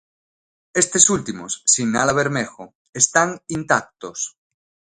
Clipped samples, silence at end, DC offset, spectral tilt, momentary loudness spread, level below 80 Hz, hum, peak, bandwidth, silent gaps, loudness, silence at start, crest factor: under 0.1%; 0.65 s; under 0.1%; -2.5 dB/octave; 15 LU; -56 dBFS; none; 0 dBFS; 11.5 kHz; 2.75-2.93 s; -18 LUFS; 0.75 s; 22 dB